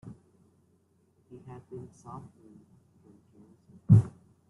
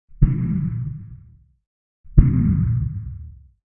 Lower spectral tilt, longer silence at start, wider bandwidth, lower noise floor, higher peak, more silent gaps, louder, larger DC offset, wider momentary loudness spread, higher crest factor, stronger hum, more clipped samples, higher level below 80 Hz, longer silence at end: second, -11 dB/octave vs -14.5 dB/octave; first, 1.75 s vs 0.2 s; second, 2 kHz vs 2.6 kHz; first, -68 dBFS vs -49 dBFS; second, -8 dBFS vs 0 dBFS; second, none vs 1.67-2.04 s; second, -24 LUFS vs -21 LUFS; neither; first, 28 LU vs 20 LU; about the same, 24 dB vs 20 dB; neither; neither; second, -58 dBFS vs -26 dBFS; about the same, 0.4 s vs 0.45 s